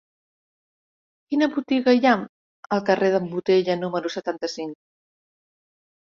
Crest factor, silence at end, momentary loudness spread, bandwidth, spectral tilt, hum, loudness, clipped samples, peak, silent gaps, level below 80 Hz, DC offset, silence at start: 20 dB; 1.3 s; 11 LU; 7.4 kHz; -6 dB/octave; none; -22 LUFS; under 0.1%; -4 dBFS; 2.29-2.63 s; -68 dBFS; under 0.1%; 1.3 s